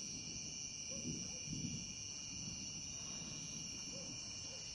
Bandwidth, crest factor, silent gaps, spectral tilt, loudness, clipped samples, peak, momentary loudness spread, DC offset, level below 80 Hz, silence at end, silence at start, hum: 11.5 kHz; 16 dB; none; -2 dB/octave; -45 LUFS; under 0.1%; -30 dBFS; 2 LU; under 0.1%; -66 dBFS; 0 s; 0 s; none